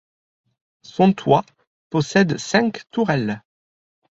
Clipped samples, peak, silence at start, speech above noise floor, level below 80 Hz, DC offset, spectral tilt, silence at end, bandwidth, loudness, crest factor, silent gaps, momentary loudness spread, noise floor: under 0.1%; -2 dBFS; 1 s; over 71 dB; -60 dBFS; under 0.1%; -6 dB/octave; 0.8 s; 8 kHz; -20 LUFS; 20 dB; 1.67-1.90 s; 9 LU; under -90 dBFS